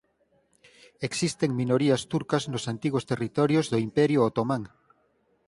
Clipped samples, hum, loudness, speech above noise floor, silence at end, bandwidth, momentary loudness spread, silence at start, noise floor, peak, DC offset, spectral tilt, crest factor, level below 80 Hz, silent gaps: under 0.1%; none; -26 LUFS; 43 dB; 0.8 s; 11.5 kHz; 8 LU; 1 s; -68 dBFS; -8 dBFS; under 0.1%; -6 dB/octave; 18 dB; -62 dBFS; none